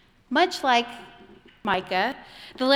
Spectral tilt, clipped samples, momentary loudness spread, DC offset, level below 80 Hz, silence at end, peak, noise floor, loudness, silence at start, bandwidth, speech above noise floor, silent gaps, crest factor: -3.5 dB/octave; under 0.1%; 18 LU; under 0.1%; -62 dBFS; 0 s; -6 dBFS; -51 dBFS; -24 LUFS; 0.3 s; 16 kHz; 27 dB; none; 20 dB